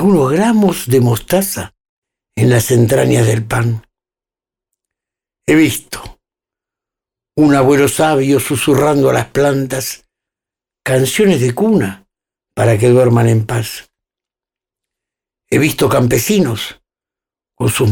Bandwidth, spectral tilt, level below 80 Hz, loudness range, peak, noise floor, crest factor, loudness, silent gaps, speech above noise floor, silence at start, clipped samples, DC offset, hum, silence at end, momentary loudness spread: 18.5 kHz; -5.5 dB/octave; -44 dBFS; 4 LU; -2 dBFS; under -90 dBFS; 12 dB; -13 LUFS; 1.89-2.02 s; over 78 dB; 0 s; under 0.1%; under 0.1%; none; 0 s; 13 LU